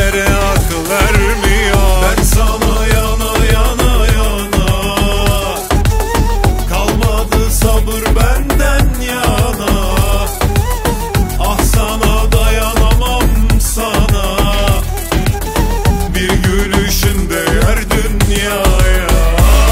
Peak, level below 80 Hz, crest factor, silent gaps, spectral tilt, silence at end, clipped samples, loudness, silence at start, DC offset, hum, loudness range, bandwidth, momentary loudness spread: 0 dBFS; -14 dBFS; 10 dB; none; -4.5 dB/octave; 0 s; under 0.1%; -13 LUFS; 0 s; under 0.1%; none; 2 LU; 16.5 kHz; 4 LU